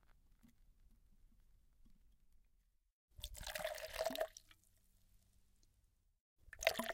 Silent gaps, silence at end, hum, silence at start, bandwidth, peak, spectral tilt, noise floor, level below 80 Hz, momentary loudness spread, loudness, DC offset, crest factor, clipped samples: 2.92-3.08 s, 6.21-6.36 s; 0 s; none; 0.45 s; 17 kHz; -14 dBFS; -2 dB/octave; -77 dBFS; -64 dBFS; 17 LU; -44 LUFS; under 0.1%; 36 dB; under 0.1%